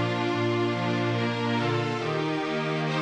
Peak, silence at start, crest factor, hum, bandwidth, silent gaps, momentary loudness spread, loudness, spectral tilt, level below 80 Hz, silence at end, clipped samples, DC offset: -14 dBFS; 0 s; 12 dB; none; 9.6 kHz; none; 2 LU; -27 LUFS; -6.5 dB/octave; -66 dBFS; 0 s; under 0.1%; under 0.1%